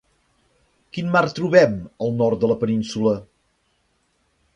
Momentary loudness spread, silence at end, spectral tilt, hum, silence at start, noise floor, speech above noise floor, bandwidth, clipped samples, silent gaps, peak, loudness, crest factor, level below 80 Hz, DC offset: 12 LU; 1.3 s; -6.5 dB/octave; none; 0.95 s; -67 dBFS; 48 dB; 10.5 kHz; under 0.1%; none; 0 dBFS; -20 LUFS; 22 dB; -56 dBFS; under 0.1%